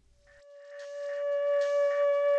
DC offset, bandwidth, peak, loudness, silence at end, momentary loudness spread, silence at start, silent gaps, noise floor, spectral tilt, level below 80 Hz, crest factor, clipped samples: under 0.1%; 8 kHz; -20 dBFS; -29 LUFS; 0 s; 18 LU; 0.5 s; none; -58 dBFS; -0.5 dB/octave; -74 dBFS; 10 dB; under 0.1%